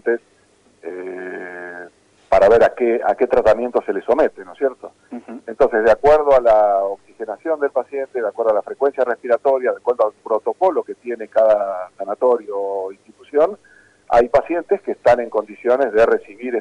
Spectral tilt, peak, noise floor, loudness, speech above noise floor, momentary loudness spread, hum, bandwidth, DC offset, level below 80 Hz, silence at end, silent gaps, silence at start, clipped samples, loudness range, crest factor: -6 dB/octave; -6 dBFS; -56 dBFS; -18 LUFS; 38 dB; 17 LU; none; 10 kHz; under 0.1%; -46 dBFS; 0 s; none; 0.05 s; under 0.1%; 3 LU; 12 dB